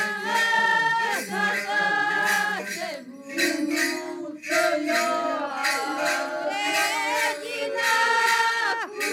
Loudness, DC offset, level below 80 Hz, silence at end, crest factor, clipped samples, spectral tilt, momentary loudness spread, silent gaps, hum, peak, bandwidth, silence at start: -23 LUFS; under 0.1%; -78 dBFS; 0 s; 16 dB; under 0.1%; -1.5 dB/octave; 9 LU; none; none; -10 dBFS; 17.5 kHz; 0 s